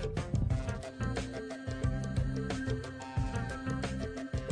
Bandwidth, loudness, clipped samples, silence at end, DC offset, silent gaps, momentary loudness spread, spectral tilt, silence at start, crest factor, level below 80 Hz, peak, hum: 10 kHz; -36 LUFS; under 0.1%; 0 s; under 0.1%; none; 5 LU; -6.5 dB/octave; 0 s; 14 dB; -42 dBFS; -22 dBFS; none